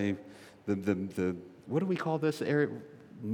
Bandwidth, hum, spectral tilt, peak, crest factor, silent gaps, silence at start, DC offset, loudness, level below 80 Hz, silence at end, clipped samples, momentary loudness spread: 18 kHz; none; -7.5 dB/octave; -16 dBFS; 18 dB; none; 0 s; under 0.1%; -33 LUFS; -78 dBFS; 0 s; under 0.1%; 14 LU